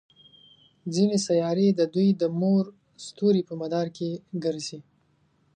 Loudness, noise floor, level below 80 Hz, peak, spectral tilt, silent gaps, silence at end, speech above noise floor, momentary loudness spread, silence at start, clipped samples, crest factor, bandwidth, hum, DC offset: -25 LUFS; -66 dBFS; -72 dBFS; -10 dBFS; -6.5 dB/octave; none; 0.75 s; 42 dB; 14 LU; 0.85 s; under 0.1%; 16 dB; 9.6 kHz; none; under 0.1%